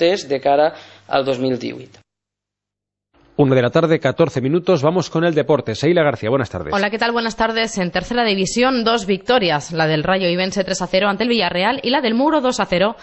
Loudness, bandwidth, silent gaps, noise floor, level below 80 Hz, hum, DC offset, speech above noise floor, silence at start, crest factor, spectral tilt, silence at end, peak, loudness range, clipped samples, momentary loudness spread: -17 LUFS; 8.4 kHz; none; -84 dBFS; -48 dBFS; 50 Hz at -45 dBFS; under 0.1%; 67 dB; 0 s; 16 dB; -5 dB/octave; 0 s; -2 dBFS; 3 LU; under 0.1%; 5 LU